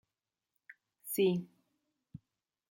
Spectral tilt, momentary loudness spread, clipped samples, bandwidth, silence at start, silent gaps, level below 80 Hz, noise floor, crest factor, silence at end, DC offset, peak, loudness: -5.5 dB/octave; 25 LU; under 0.1%; 16.5 kHz; 1.05 s; none; -78 dBFS; under -90 dBFS; 20 dB; 0.55 s; under 0.1%; -20 dBFS; -33 LUFS